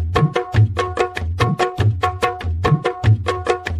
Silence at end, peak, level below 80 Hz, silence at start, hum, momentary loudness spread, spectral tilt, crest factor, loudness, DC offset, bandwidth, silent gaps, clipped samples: 0 s; -2 dBFS; -32 dBFS; 0 s; none; 4 LU; -6.5 dB/octave; 16 dB; -19 LUFS; under 0.1%; 12 kHz; none; under 0.1%